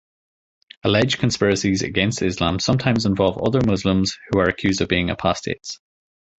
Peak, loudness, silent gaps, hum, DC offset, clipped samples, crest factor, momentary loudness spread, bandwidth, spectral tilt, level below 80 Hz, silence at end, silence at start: -2 dBFS; -20 LUFS; none; none; under 0.1%; under 0.1%; 20 dB; 7 LU; 8.2 kHz; -5 dB/octave; -42 dBFS; 0.65 s; 0.85 s